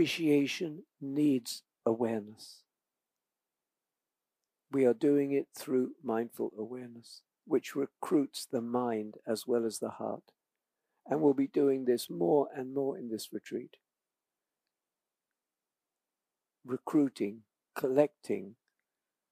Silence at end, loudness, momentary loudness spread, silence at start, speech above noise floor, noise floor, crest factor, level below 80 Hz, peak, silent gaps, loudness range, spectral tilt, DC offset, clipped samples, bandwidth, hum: 0.8 s; -33 LUFS; 14 LU; 0 s; over 58 dB; under -90 dBFS; 22 dB; -90 dBFS; -12 dBFS; none; 8 LU; -5.5 dB/octave; under 0.1%; under 0.1%; 15.5 kHz; none